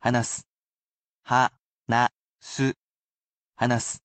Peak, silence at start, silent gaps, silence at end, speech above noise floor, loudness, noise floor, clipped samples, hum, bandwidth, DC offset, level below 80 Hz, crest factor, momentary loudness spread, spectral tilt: -8 dBFS; 0.05 s; 0.50-1.23 s, 1.60-1.80 s, 2.15-2.35 s, 2.76-3.51 s; 0.1 s; over 66 dB; -26 LUFS; under -90 dBFS; under 0.1%; none; 9 kHz; under 0.1%; -62 dBFS; 20 dB; 13 LU; -4.5 dB/octave